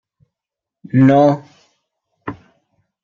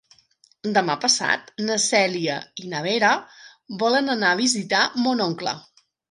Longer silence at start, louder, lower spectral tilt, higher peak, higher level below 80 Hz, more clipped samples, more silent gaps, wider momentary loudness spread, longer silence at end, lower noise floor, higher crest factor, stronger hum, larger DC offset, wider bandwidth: first, 0.95 s vs 0.65 s; first, -14 LUFS vs -21 LUFS; first, -9.5 dB/octave vs -2.5 dB/octave; about the same, -2 dBFS vs -2 dBFS; first, -60 dBFS vs -72 dBFS; neither; neither; first, 21 LU vs 10 LU; first, 0.7 s vs 0.5 s; first, -85 dBFS vs -60 dBFS; about the same, 16 dB vs 20 dB; neither; neither; second, 6.8 kHz vs 11.5 kHz